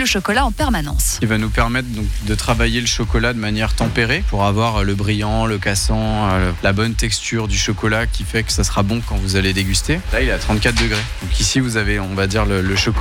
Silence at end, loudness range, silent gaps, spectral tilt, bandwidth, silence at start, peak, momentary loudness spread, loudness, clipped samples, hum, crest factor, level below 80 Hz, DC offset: 0 s; 1 LU; none; -4 dB/octave; 16.5 kHz; 0 s; -4 dBFS; 3 LU; -18 LUFS; under 0.1%; none; 14 dB; -24 dBFS; under 0.1%